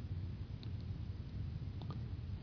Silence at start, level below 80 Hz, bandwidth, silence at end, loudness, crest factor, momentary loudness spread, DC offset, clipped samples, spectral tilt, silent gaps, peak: 0 s; -50 dBFS; 5.4 kHz; 0 s; -46 LUFS; 10 dB; 1 LU; under 0.1%; under 0.1%; -8 dB/octave; none; -32 dBFS